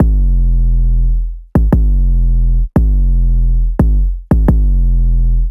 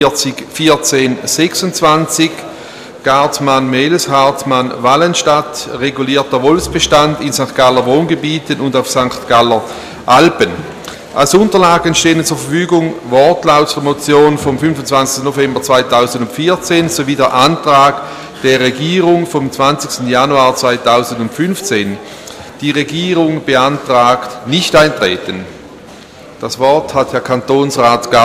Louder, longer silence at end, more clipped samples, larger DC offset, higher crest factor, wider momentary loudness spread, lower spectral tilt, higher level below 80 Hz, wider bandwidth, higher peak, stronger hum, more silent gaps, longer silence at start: second, -15 LUFS vs -11 LUFS; about the same, 0 s vs 0 s; second, under 0.1% vs 0.1%; neither; about the same, 8 dB vs 12 dB; second, 3 LU vs 9 LU; first, -11 dB/octave vs -4 dB/octave; first, -10 dBFS vs -42 dBFS; second, 2 kHz vs 16 kHz; about the same, -2 dBFS vs 0 dBFS; neither; neither; about the same, 0 s vs 0 s